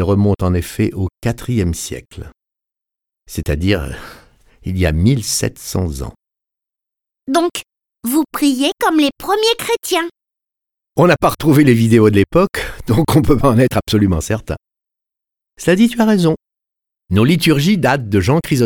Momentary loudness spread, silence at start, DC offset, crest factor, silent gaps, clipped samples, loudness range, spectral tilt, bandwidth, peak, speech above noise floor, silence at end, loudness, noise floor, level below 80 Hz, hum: 15 LU; 0 s; under 0.1%; 16 dB; none; under 0.1%; 8 LU; -5.5 dB/octave; 19 kHz; 0 dBFS; 71 dB; 0 s; -15 LUFS; -85 dBFS; -34 dBFS; none